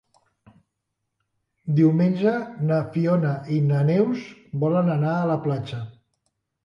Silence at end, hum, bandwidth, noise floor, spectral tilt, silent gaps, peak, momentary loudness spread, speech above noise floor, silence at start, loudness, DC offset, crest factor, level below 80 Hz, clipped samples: 0.75 s; none; 6.6 kHz; -80 dBFS; -10 dB/octave; none; -8 dBFS; 13 LU; 58 dB; 1.65 s; -22 LUFS; under 0.1%; 16 dB; -64 dBFS; under 0.1%